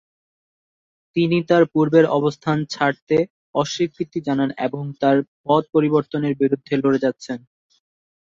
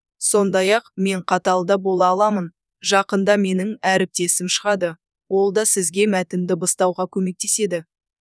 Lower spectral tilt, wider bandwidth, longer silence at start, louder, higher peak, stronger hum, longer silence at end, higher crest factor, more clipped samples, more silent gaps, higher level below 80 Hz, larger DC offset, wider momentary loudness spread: first, -6.5 dB/octave vs -3.5 dB/octave; second, 7.6 kHz vs 11 kHz; first, 1.15 s vs 0.2 s; about the same, -20 LUFS vs -19 LUFS; about the same, -2 dBFS vs -4 dBFS; neither; first, 0.9 s vs 0.45 s; about the same, 18 dB vs 16 dB; neither; first, 3.02-3.07 s, 3.30-3.53 s, 5.28-5.44 s vs none; first, -62 dBFS vs -70 dBFS; neither; about the same, 9 LU vs 7 LU